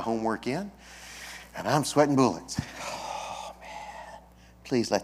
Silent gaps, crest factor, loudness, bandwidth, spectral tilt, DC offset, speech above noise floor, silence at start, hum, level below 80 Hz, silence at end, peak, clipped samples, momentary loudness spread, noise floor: none; 22 dB; -29 LUFS; 16 kHz; -5 dB/octave; under 0.1%; 25 dB; 0 s; none; -56 dBFS; 0 s; -6 dBFS; under 0.1%; 20 LU; -52 dBFS